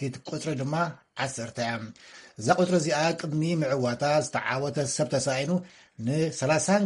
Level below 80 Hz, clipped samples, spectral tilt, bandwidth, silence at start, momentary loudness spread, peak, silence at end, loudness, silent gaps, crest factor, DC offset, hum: -64 dBFS; under 0.1%; -5 dB/octave; 11.5 kHz; 0 s; 10 LU; -8 dBFS; 0 s; -27 LUFS; none; 20 dB; under 0.1%; none